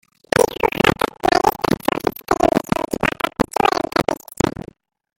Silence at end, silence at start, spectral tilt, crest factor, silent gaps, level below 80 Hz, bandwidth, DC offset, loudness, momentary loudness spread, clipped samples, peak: 0.7 s; 0.35 s; -4.5 dB/octave; 20 dB; none; -42 dBFS; 17 kHz; under 0.1%; -19 LUFS; 6 LU; under 0.1%; 0 dBFS